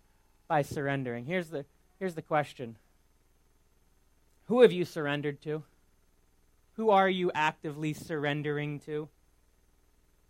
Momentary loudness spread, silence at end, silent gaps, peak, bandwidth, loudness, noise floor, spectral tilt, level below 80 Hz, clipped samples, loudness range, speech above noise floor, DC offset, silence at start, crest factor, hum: 16 LU; 1.2 s; none; -8 dBFS; 16 kHz; -30 LUFS; -66 dBFS; -6.5 dB/octave; -66 dBFS; under 0.1%; 8 LU; 37 dB; under 0.1%; 0.5 s; 26 dB; none